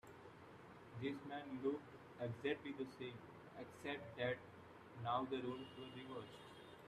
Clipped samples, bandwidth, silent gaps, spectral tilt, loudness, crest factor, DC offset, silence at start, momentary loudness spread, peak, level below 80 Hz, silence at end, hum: under 0.1%; 14.5 kHz; none; -6.5 dB/octave; -48 LUFS; 20 dB; under 0.1%; 0.05 s; 16 LU; -28 dBFS; -80 dBFS; 0 s; none